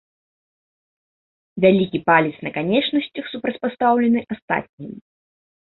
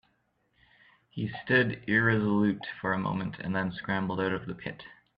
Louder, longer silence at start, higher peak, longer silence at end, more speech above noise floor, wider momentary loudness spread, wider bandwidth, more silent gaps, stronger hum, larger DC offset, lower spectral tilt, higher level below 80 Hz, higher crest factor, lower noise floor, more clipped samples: first, -20 LUFS vs -29 LUFS; first, 1.55 s vs 1.15 s; first, -2 dBFS vs -10 dBFS; first, 0.7 s vs 0.25 s; first, over 70 dB vs 44 dB; about the same, 15 LU vs 13 LU; second, 4.2 kHz vs 5.2 kHz; first, 4.42-4.48 s, 4.69-4.78 s vs none; neither; neither; first, -10.5 dB/octave vs -9 dB/octave; about the same, -60 dBFS vs -62 dBFS; about the same, 20 dB vs 20 dB; first, under -90 dBFS vs -73 dBFS; neither